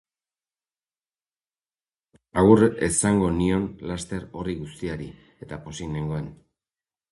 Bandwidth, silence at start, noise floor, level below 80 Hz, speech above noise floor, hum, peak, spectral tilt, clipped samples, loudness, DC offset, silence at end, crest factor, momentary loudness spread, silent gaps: 11.5 kHz; 2.35 s; under -90 dBFS; -46 dBFS; over 67 dB; none; -2 dBFS; -6 dB/octave; under 0.1%; -24 LUFS; under 0.1%; 0.75 s; 24 dB; 19 LU; none